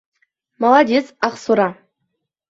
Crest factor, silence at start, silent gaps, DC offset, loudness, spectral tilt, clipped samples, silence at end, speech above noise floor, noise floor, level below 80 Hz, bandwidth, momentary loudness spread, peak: 18 dB; 0.6 s; none; under 0.1%; -17 LUFS; -5.5 dB/octave; under 0.1%; 0.75 s; 59 dB; -74 dBFS; -64 dBFS; 7.8 kHz; 9 LU; -2 dBFS